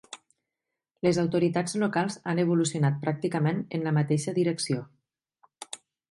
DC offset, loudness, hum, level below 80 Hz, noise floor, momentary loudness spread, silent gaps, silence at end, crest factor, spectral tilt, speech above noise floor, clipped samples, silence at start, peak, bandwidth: under 0.1%; -27 LUFS; none; -70 dBFS; -87 dBFS; 17 LU; none; 0.35 s; 18 dB; -6 dB/octave; 61 dB; under 0.1%; 0.1 s; -10 dBFS; 11.5 kHz